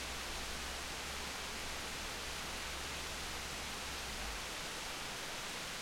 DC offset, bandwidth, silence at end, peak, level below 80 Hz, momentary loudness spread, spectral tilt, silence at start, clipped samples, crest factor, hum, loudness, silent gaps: under 0.1%; 16.5 kHz; 0 s; -30 dBFS; -54 dBFS; 0 LU; -1.5 dB/octave; 0 s; under 0.1%; 14 dB; none; -41 LUFS; none